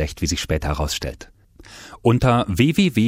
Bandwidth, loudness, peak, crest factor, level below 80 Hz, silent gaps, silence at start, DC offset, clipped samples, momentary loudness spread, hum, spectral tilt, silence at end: 16 kHz; -20 LUFS; -4 dBFS; 16 dB; -34 dBFS; none; 0 s; under 0.1%; under 0.1%; 20 LU; none; -5.5 dB/octave; 0 s